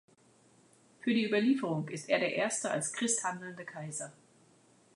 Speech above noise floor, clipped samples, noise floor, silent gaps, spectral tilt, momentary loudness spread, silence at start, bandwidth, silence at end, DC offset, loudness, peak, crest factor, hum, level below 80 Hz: 32 dB; under 0.1%; -65 dBFS; none; -3.5 dB/octave; 13 LU; 1.05 s; 11.5 kHz; 0.85 s; under 0.1%; -33 LUFS; -14 dBFS; 20 dB; none; -84 dBFS